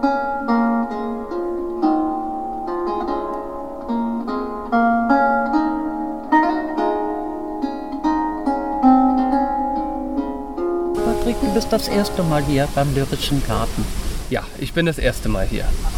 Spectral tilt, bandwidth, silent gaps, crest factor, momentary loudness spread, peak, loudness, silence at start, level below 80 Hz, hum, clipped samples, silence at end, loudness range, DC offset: -6 dB/octave; 16.5 kHz; none; 16 dB; 9 LU; -2 dBFS; -21 LUFS; 0 s; -30 dBFS; none; under 0.1%; 0 s; 3 LU; 0.9%